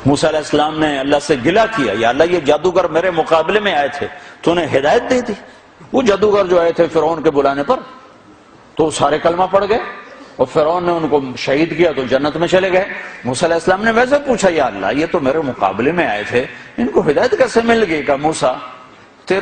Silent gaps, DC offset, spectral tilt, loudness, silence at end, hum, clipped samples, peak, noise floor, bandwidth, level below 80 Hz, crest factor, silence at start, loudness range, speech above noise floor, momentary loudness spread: none; under 0.1%; -5 dB/octave; -15 LUFS; 0 s; none; under 0.1%; 0 dBFS; -43 dBFS; 9.8 kHz; -44 dBFS; 14 dB; 0 s; 2 LU; 28 dB; 7 LU